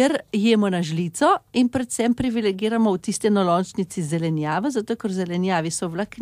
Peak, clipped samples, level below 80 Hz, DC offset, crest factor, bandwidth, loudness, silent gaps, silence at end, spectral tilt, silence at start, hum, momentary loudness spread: -6 dBFS; under 0.1%; -56 dBFS; under 0.1%; 16 dB; 15 kHz; -22 LUFS; none; 0 s; -5.5 dB/octave; 0 s; none; 6 LU